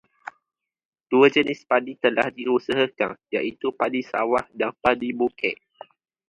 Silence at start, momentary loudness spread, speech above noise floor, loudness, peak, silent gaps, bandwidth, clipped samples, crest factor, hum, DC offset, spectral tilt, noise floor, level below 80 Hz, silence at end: 1.1 s; 10 LU; 59 dB; -23 LUFS; -2 dBFS; none; 9.6 kHz; under 0.1%; 22 dB; none; under 0.1%; -5.5 dB/octave; -81 dBFS; -62 dBFS; 0.75 s